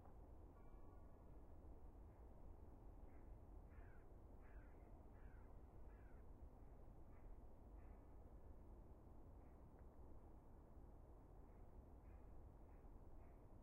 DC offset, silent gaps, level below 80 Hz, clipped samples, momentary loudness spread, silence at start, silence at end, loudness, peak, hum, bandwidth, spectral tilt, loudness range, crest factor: under 0.1%; none; -64 dBFS; under 0.1%; 2 LU; 0 s; 0 s; -66 LUFS; -50 dBFS; none; 2.8 kHz; -7 dB/octave; 1 LU; 12 dB